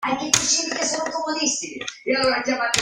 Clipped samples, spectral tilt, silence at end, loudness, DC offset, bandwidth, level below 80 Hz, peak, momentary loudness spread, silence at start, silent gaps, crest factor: under 0.1%; -1 dB/octave; 0 s; -21 LUFS; under 0.1%; 16 kHz; -56 dBFS; 0 dBFS; 8 LU; 0 s; none; 22 dB